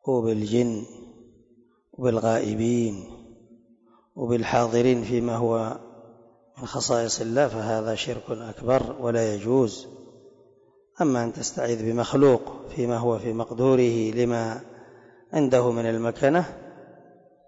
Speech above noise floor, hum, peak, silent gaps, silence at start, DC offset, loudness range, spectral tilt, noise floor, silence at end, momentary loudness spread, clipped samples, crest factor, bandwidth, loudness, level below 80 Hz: 37 dB; none; -8 dBFS; none; 0.05 s; under 0.1%; 4 LU; -5.5 dB/octave; -60 dBFS; 0.65 s; 14 LU; under 0.1%; 16 dB; 8 kHz; -24 LUFS; -56 dBFS